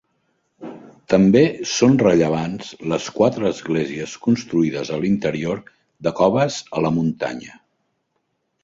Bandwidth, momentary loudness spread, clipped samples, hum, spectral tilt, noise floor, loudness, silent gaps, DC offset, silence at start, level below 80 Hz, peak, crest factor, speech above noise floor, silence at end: 7.8 kHz; 14 LU; under 0.1%; none; -6 dB/octave; -72 dBFS; -19 LUFS; none; under 0.1%; 0.6 s; -54 dBFS; -2 dBFS; 18 dB; 53 dB; 1.15 s